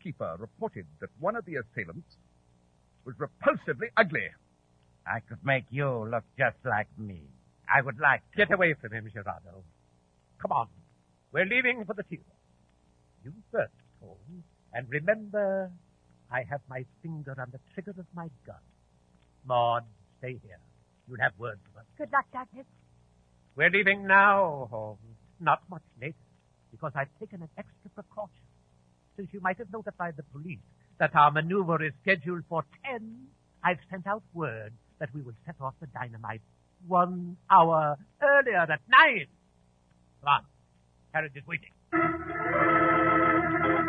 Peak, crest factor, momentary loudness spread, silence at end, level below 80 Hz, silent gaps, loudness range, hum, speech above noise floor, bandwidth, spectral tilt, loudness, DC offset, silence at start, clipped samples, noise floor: -6 dBFS; 24 dB; 21 LU; 0 s; -64 dBFS; none; 13 LU; none; 37 dB; 5.8 kHz; -8 dB/octave; -27 LUFS; under 0.1%; 0.05 s; under 0.1%; -66 dBFS